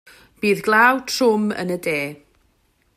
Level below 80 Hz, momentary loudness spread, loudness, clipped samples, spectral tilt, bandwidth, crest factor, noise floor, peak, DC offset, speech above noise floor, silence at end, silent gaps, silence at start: -62 dBFS; 10 LU; -19 LUFS; under 0.1%; -4 dB/octave; 15.5 kHz; 18 dB; -63 dBFS; -2 dBFS; under 0.1%; 44 dB; 0.8 s; none; 0.4 s